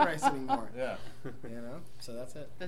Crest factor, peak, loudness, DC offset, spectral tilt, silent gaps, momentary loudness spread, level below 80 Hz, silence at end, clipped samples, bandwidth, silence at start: 22 dB; -12 dBFS; -35 LUFS; 1%; -4.5 dB/octave; none; 17 LU; -60 dBFS; 0 s; under 0.1%; 16 kHz; 0 s